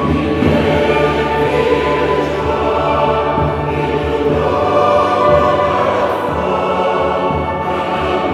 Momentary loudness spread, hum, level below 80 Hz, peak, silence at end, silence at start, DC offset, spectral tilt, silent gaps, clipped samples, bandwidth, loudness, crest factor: 5 LU; none; -32 dBFS; 0 dBFS; 0 s; 0 s; under 0.1%; -7 dB/octave; none; under 0.1%; 13.5 kHz; -14 LUFS; 14 dB